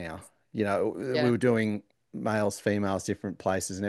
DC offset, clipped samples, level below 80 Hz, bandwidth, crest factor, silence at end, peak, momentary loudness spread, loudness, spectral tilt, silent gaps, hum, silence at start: under 0.1%; under 0.1%; -64 dBFS; 12.5 kHz; 18 dB; 0 s; -12 dBFS; 14 LU; -29 LUFS; -5.5 dB/octave; none; none; 0 s